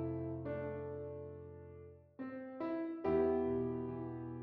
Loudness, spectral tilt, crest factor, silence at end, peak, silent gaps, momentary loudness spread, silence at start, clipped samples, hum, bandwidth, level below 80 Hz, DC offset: -40 LUFS; -9 dB/octave; 18 dB; 0 s; -22 dBFS; none; 18 LU; 0 s; under 0.1%; none; 4.7 kHz; -64 dBFS; under 0.1%